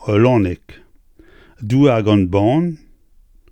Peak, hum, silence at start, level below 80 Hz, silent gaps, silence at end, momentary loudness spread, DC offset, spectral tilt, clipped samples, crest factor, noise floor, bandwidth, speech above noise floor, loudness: -2 dBFS; none; 0 s; -46 dBFS; none; 0.75 s; 19 LU; under 0.1%; -8.5 dB/octave; under 0.1%; 16 dB; -49 dBFS; 9.2 kHz; 35 dB; -15 LUFS